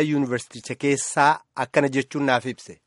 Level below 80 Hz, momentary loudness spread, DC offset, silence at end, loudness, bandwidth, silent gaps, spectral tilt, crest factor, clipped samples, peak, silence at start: -66 dBFS; 9 LU; under 0.1%; 0.1 s; -23 LUFS; 11.5 kHz; none; -4.5 dB/octave; 20 dB; under 0.1%; -4 dBFS; 0 s